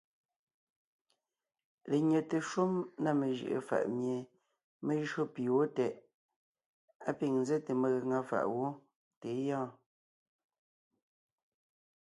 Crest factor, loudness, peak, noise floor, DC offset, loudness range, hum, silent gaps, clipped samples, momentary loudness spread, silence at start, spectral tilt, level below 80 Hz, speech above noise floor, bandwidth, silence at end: 18 dB; -35 LUFS; -18 dBFS; under -90 dBFS; under 0.1%; 5 LU; none; 4.64-4.80 s, 6.14-6.29 s, 6.36-6.55 s, 6.66-6.88 s, 6.95-7.00 s, 8.96-9.11 s, 9.17-9.21 s; under 0.1%; 10 LU; 1.85 s; -7 dB/octave; -82 dBFS; over 56 dB; 11.5 kHz; 2.35 s